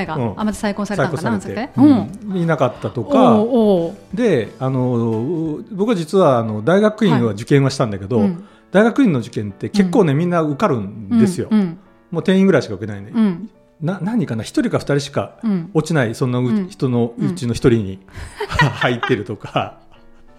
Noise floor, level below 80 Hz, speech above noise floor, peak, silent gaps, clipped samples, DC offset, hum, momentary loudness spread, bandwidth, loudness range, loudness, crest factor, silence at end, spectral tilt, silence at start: -43 dBFS; -46 dBFS; 26 dB; 0 dBFS; none; under 0.1%; under 0.1%; none; 10 LU; 13 kHz; 4 LU; -18 LUFS; 16 dB; 0.65 s; -7 dB/octave; 0 s